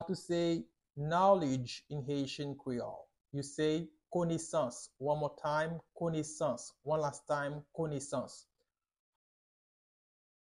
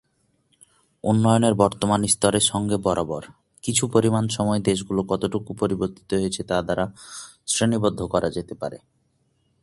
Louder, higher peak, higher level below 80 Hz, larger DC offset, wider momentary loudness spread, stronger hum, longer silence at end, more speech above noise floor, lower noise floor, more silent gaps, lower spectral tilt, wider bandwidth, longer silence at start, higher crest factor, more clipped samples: second, -36 LUFS vs -22 LUFS; second, -16 dBFS vs -2 dBFS; second, -70 dBFS vs -50 dBFS; neither; about the same, 11 LU vs 12 LU; neither; first, 2.05 s vs 0.85 s; first, 50 dB vs 45 dB; first, -86 dBFS vs -67 dBFS; neither; about the same, -5.5 dB/octave vs -4.5 dB/octave; about the same, 11.5 kHz vs 11.5 kHz; second, 0 s vs 1.05 s; about the same, 20 dB vs 20 dB; neither